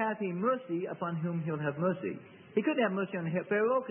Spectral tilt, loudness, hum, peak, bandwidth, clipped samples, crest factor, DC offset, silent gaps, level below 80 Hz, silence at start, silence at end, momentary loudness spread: -11 dB/octave; -33 LUFS; none; -16 dBFS; 3.5 kHz; under 0.1%; 16 dB; under 0.1%; none; -78 dBFS; 0 s; 0 s; 7 LU